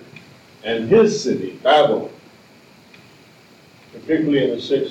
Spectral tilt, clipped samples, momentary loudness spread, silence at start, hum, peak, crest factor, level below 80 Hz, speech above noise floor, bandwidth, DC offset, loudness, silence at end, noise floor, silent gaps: -5 dB/octave; under 0.1%; 13 LU; 0.65 s; none; -4 dBFS; 16 dB; -62 dBFS; 31 dB; 9 kHz; under 0.1%; -18 LUFS; 0 s; -48 dBFS; none